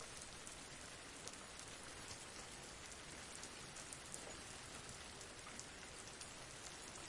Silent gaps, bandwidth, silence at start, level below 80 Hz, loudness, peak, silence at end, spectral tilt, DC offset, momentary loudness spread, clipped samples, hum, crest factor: none; 12 kHz; 0 s; -68 dBFS; -52 LUFS; -28 dBFS; 0 s; -2 dB/octave; under 0.1%; 2 LU; under 0.1%; none; 26 dB